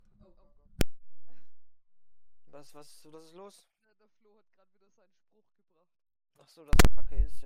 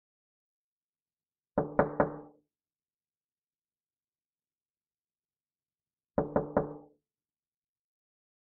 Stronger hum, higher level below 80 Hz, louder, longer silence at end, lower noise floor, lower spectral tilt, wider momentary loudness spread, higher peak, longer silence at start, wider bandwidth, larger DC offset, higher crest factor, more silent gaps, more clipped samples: neither; first, -36 dBFS vs -60 dBFS; first, -30 LUFS vs -33 LUFS; second, 0 s vs 1.55 s; second, -72 dBFS vs under -90 dBFS; second, -4.5 dB/octave vs -9.5 dB/octave; first, 27 LU vs 13 LU; about the same, -10 dBFS vs -10 dBFS; second, 0.8 s vs 1.55 s; first, 15.5 kHz vs 3.1 kHz; neither; second, 16 dB vs 30 dB; second, none vs 3.17-3.29 s, 4.62-4.74 s; neither